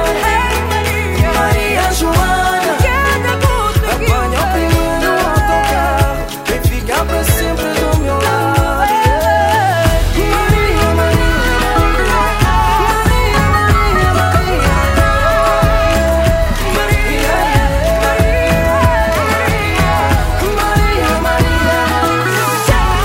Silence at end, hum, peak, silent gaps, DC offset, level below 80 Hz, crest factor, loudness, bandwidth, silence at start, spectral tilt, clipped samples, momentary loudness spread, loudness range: 0 s; none; 0 dBFS; none; under 0.1%; -18 dBFS; 12 dB; -13 LUFS; 16.5 kHz; 0 s; -5 dB/octave; under 0.1%; 3 LU; 2 LU